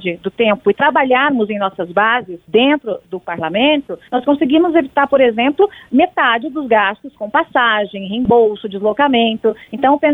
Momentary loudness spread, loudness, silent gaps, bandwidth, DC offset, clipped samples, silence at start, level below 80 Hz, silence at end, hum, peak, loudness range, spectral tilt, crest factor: 7 LU; -15 LUFS; none; 4 kHz; under 0.1%; under 0.1%; 0 s; -52 dBFS; 0 s; none; -2 dBFS; 1 LU; -7.5 dB/octave; 14 dB